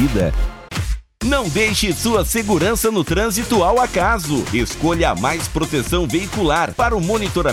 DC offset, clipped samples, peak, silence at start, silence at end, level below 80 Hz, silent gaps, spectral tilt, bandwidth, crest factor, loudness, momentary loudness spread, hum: under 0.1%; under 0.1%; -6 dBFS; 0 s; 0 s; -28 dBFS; none; -4.5 dB/octave; 17 kHz; 12 dB; -18 LUFS; 5 LU; none